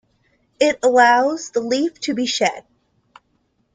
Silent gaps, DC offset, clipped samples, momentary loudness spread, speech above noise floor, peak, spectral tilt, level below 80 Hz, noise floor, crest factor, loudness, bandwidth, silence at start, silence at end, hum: none; under 0.1%; under 0.1%; 9 LU; 48 dB; -2 dBFS; -2.5 dB/octave; -64 dBFS; -66 dBFS; 18 dB; -18 LUFS; 9.6 kHz; 0.6 s; 1.15 s; none